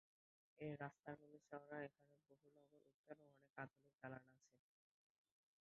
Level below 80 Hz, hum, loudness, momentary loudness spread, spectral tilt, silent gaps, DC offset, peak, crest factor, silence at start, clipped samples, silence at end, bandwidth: under -90 dBFS; none; -58 LUFS; 11 LU; -6.5 dB/octave; 2.94-3.04 s, 3.50-3.54 s, 3.95-3.99 s; under 0.1%; -36 dBFS; 24 dB; 0.55 s; under 0.1%; 1.05 s; 6.4 kHz